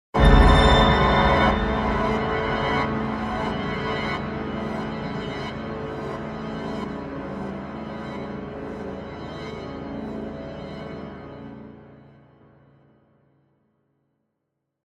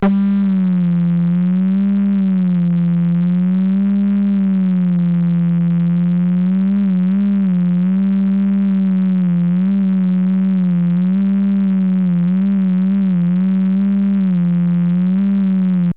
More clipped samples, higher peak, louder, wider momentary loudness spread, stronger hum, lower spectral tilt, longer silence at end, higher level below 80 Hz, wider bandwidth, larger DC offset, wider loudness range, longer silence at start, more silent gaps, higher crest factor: neither; first, -2 dBFS vs -6 dBFS; second, -24 LUFS vs -15 LUFS; first, 18 LU vs 0 LU; neither; second, -6.5 dB/octave vs -12.5 dB/octave; first, 2.85 s vs 0.05 s; first, -30 dBFS vs -56 dBFS; first, 11.5 kHz vs 3.7 kHz; second, under 0.1% vs 0.5%; first, 18 LU vs 0 LU; first, 0.15 s vs 0 s; neither; first, 22 dB vs 8 dB